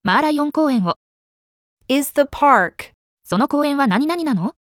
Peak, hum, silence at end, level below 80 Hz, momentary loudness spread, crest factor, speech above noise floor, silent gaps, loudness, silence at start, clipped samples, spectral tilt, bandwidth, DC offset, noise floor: 0 dBFS; none; 0.3 s; -52 dBFS; 10 LU; 18 dB; over 73 dB; 0.96-1.77 s, 2.94-3.17 s; -18 LUFS; 0.05 s; under 0.1%; -5.5 dB/octave; 19.5 kHz; under 0.1%; under -90 dBFS